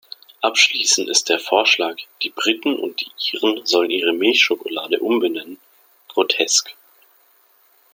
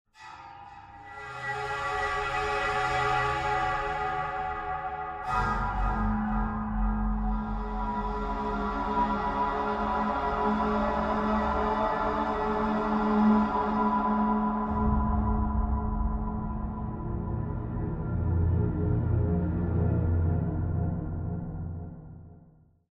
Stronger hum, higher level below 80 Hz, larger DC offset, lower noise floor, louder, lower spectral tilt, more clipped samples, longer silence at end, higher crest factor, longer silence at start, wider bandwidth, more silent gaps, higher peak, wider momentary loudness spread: neither; second, -74 dBFS vs -36 dBFS; neither; about the same, -56 dBFS vs -58 dBFS; first, -18 LUFS vs -29 LUFS; second, 0 dB/octave vs -8 dB/octave; neither; first, 1.2 s vs 0.55 s; first, 20 dB vs 14 dB; first, 0.4 s vs 0.2 s; first, 17 kHz vs 9.6 kHz; neither; first, 0 dBFS vs -14 dBFS; about the same, 11 LU vs 9 LU